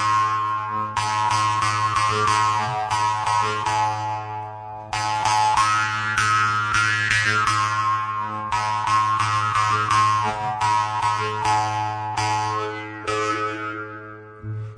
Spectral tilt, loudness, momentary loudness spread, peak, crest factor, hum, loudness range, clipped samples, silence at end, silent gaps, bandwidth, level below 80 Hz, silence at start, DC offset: -3 dB/octave; -21 LUFS; 11 LU; -4 dBFS; 18 dB; none; 3 LU; under 0.1%; 0 s; none; 11 kHz; -52 dBFS; 0 s; under 0.1%